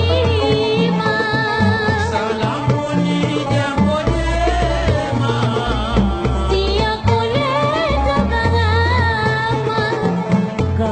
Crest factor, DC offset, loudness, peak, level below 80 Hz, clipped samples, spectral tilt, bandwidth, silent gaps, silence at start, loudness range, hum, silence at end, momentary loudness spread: 16 dB; under 0.1%; -17 LUFS; 0 dBFS; -26 dBFS; under 0.1%; -6.5 dB/octave; 9 kHz; none; 0 s; 1 LU; none; 0 s; 3 LU